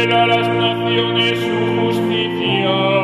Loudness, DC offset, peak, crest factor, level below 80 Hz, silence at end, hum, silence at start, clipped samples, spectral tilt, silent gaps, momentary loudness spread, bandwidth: -16 LUFS; under 0.1%; -2 dBFS; 14 dB; -52 dBFS; 0 s; none; 0 s; under 0.1%; -6 dB/octave; none; 4 LU; 13 kHz